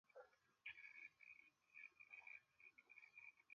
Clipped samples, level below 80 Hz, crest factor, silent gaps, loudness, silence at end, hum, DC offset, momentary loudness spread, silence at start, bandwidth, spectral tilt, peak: under 0.1%; under -90 dBFS; 22 dB; none; -62 LUFS; 0 s; none; under 0.1%; 9 LU; 0.05 s; 6.8 kHz; 1.5 dB/octave; -44 dBFS